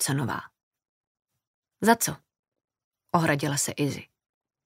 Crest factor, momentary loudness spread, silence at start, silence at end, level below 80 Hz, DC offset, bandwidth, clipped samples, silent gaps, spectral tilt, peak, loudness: 24 dB; 13 LU; 0 s; 0.6 s; -66 dBFS; under 0.1%; 16 kHz; under 0.1%; 0.63-0.71 s, 0.89-1.15 s, 1.47-1.63 s, 2.39-2.52 s, 2.64-2.68 s, 2.84-2.91 s; -4 dB/octave; -6 dBFS; -26 LUFS